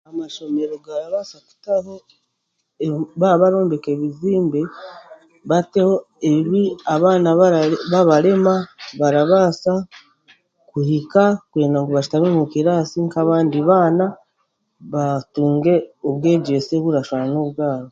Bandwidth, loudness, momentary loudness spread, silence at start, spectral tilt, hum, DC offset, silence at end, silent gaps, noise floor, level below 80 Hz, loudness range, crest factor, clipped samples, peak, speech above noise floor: 7.8 kHz; -18 LUFS; 12 LU; 0.1 s; -7.5 dB/octave; none; under 0.1%; 0.05 s; none; -73 dBFS; -60 dBFS; 4 LU; 18 dB; under 0.1%; 0 dBFS; 56 dB